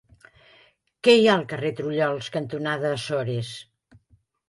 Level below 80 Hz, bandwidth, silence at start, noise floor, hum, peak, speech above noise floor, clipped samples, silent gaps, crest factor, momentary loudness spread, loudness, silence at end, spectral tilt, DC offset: -64 dBFS; 11.5 kHz; 1.05 s; -63 dBFS; none; -4 dBFS; 40 dB; under 0.1%; none; 20 dB; 13 LU; -23 LUFS; 0.85 s; -5.5 dB/octave; under 0.1%